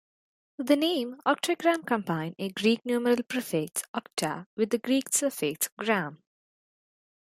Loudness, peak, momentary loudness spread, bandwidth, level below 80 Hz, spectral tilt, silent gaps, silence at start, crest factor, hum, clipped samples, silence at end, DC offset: -28 LUFS; -10 dBFS; 7 LU; 16 kHz; -76 dBFS; -3.5 dB/octave; 3.88-3.94 s, 4.46-4.57 s, 5.72-5.77 s; 0.6 s; 20 dB; none; under 0.1%; 1.2 s; under 0.1%